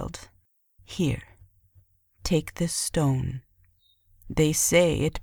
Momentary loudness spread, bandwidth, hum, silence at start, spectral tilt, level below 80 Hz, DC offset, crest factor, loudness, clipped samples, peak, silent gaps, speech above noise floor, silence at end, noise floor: 18 LU; over 20 kHz; none; 0 s; -4.5 dB/octave; -44 dBFS; under 0.1%; 22 dB; -25 LUFS; under 0.1%; -6 dBFS; none; 41 dB; 0 s; -65 dBFS